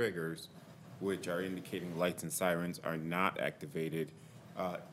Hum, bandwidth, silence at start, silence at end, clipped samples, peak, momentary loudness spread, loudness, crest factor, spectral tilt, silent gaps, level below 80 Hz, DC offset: none; 16 kHz; 0 s; 0 s; under 0.1%; -14 dBFS; 14 LU; -38 LUFS; 24 dB; -5 dB/octave; none; -76 dBFS; under 0.1%